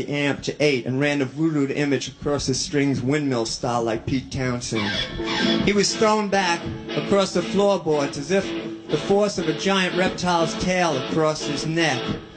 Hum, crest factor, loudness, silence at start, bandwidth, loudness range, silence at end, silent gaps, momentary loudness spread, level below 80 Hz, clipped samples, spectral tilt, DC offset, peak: none; 18 dB; -22 LUFS; 0 s; 9.4 kHz; 2 LU; 0 s; none; 6 LU; -48 dBFS; under 0.1%; -4.5 dB/octave; under 0.1%; -4 dBFS